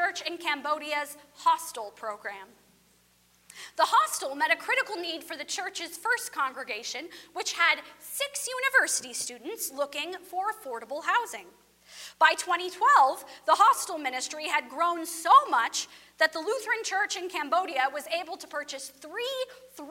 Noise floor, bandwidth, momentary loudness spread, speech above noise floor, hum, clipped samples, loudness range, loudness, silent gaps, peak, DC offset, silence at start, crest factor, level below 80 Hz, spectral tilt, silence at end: -64 dBFS; 16.5 kHz; 16 LU; 36 dB; 60 Hz at -75 dBFS; under 0.1%; 6 LU; -27 LUFS; none; -8 dBFS; under 0.1%; 0 s; 22 dB; -78 dBFS; 0.5 dB/octave; 0 s